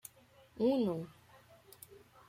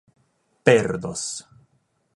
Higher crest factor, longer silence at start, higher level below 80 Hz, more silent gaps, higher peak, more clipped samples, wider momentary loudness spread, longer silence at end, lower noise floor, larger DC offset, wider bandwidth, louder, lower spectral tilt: second, 18 dB vs 24 dB; about the same, 0.55 s vs 0.65 s; second, -76 dBFS vs -58 dBFS; neither; second, -22 dBFS vs 0 dBFS; neither; first, 24 LU vs 13 LU; second, 0.3 s vs 0.75 s; second, -64 dBFS vs -68 dBFS; neither; first, 16.5 kHz vs 11.5 kHz; second, -35 LUFS vs -22 LUFS; first, -7 dB/octave vs -4.5 dB/octave